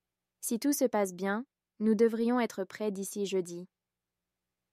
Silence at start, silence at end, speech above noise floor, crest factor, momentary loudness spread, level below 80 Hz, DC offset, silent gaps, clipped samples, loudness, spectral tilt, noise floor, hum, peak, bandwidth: 0.4 s; 1.05 s; 59 dB; 18 dB; 12 LU; -82 dBFS; under 0.1%; none; under 0.1%; -31 LUFS; -5 dB/octave; -90 dBFS; none; -14 dBFS; 16 kHz